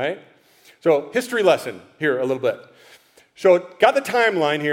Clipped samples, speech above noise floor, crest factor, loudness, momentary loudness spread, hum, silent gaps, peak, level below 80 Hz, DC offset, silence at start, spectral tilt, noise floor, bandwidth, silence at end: under 0.1%; 34 dB; 20 dB; -20 LUFS; 9 LU; none; none; 0 dBFS; -70 dBFS; under 0.1%; 0 s; -4.5 dB/octave; -53 dBFS; 16.5 kHz; 0 s